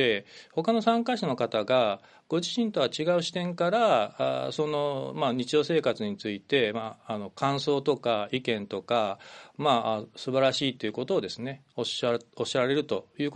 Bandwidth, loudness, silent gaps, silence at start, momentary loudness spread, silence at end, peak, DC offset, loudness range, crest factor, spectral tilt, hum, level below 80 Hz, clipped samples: 9.8 kHz; -28 LUFS; none; 0 s; 9 LU; 0 s; -8 dBFS; under 0.1%; 2 LU; 18 dB; -5 dB/octave; none; -72 dBFS; under 0.1%